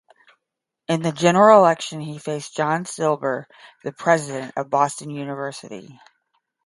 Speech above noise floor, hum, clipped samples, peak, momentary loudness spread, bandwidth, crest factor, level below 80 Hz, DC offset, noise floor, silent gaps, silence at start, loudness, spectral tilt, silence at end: 62 dB; none; under 0.1%; 0 dBFS; 21 LU; 11.5 kHz; 22 dB; -70 dBFS; under 0.1%; -83 dBFS; none; 0.9 s; -20 LUFS; -5 dB/octave; 0.7 s